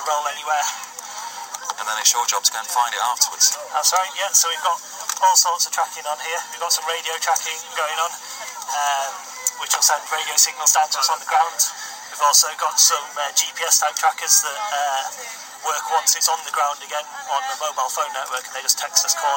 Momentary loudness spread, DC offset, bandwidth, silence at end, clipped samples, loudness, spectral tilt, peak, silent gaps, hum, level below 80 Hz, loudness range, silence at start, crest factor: 13 LU; under 0.1%; 17 kHz; 0 s; under 0.1%; -19 LUFS; 4 dB/octave; 0 dBFS; none; none; -86 dBFS; 5 LU; 0 s; 22 dB